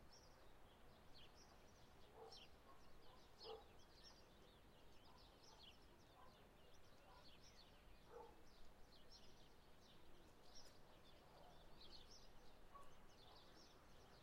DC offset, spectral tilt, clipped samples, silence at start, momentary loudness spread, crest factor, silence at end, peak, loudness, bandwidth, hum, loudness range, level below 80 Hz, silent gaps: under 0.1%; -3.5 dB/octave; under 0.1%; 0 s; 7 LU; 18 dB; 0 s; -46 dBFS; -67 LUFS; 16 kHz; none; 3 LU; -72 dBFS; none